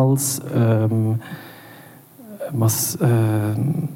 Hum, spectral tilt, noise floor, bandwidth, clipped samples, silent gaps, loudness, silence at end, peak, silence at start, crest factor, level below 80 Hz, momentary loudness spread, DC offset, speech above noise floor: none; -6 dB/octave; -44 dBFS; 17 kHz; under 0.1%; none; -20 LUFS; 0 s; -6 dBFS; 0 s; 14 dB; -66 dBFS; 19 LU; under 0.1%; 25 dB